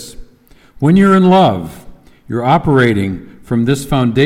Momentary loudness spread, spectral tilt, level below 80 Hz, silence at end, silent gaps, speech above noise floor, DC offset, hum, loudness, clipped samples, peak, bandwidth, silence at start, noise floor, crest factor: 15 LU; -7 dB/octave; -38 dBFS; 0 s; none; 34 dB; under 0.1%; none; -12 LUFS; under 0.1%; 0 dBFS; 14.5 kHz; 0 s; -45 dBFS; 12 dB